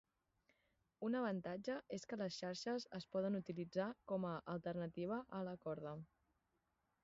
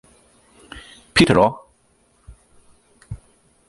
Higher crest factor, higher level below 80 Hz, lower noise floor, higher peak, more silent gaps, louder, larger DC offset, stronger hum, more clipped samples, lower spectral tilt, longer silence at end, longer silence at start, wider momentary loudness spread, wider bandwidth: second, 16 dB vs 22 dB; second, -80 dBFS vs -46 dBFS; first, -86 dBFS vs -60 dBFS; second, -30 dBFS vs 0 dBFS; neither; second, -46 LUFS vs -16 LUFS; neither; neither; neither; about the same, -5.5 dB/octave vs -5 dB/octave; first, 1 s vs 0.5 s; first, 1 s vs 0.75 s; second, 6 LU vs 26 LU; second, 7.6 kHz vs 11.5 kHz